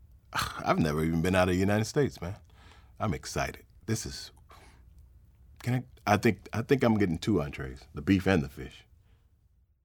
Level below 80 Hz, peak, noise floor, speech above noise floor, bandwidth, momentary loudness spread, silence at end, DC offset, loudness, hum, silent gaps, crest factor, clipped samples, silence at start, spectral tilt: -50 dBFS; -8 dBFS; -66 dBFS; 38 dB; 19 kHz; 15 LU; 1.05 s; under 0.1%; -29 LUFS; none; none; 22 dB; under 0.1%; 0.3 s; -6 dB/octave